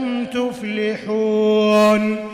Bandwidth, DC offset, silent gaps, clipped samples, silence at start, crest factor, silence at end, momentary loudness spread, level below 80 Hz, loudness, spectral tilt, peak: 15 kHz; under 0.1%; none; under 0.1%; 0 s; 12 dB; 0 s; 9 LU; -58 dBFS; -18 LUFS; -5.5 dB/octave; -6 dBFS